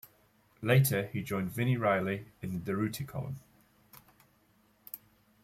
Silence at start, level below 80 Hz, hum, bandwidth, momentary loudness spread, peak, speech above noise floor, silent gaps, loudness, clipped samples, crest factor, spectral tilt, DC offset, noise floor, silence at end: 0.6 s; -66 dBFS; none; 16.5 kHz; 20 LU; -14 dBFS; 37 dB; none; -32 LUFS; under 0.1%; 20 dB; -6 dB/octave; under 0.1%; -68 dBFS; 0.45 s